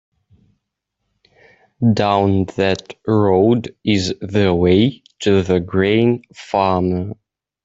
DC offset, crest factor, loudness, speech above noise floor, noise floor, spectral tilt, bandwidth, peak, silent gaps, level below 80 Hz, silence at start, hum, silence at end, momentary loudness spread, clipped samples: under 0.1%; 16 dB; -17 LUFS; 60 dB; -76 dBFS; -7 dB/octave; 8 kHz; -2 dBFS; none; -52 dBFS; 1.8 s; 50 Hz at -35 dBFS; 0.5 s; 8 LU; under 0.1%